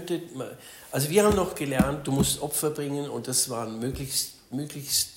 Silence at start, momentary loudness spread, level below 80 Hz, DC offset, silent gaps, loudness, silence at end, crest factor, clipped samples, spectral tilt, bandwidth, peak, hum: 0 s; 13 LU; -46 dBFS; under 0.1%; none; -27 LUFS; 0 s; 20 dB; under 0.1%; -4 dB/octave; 16.5 kHz; -8 dBFS; none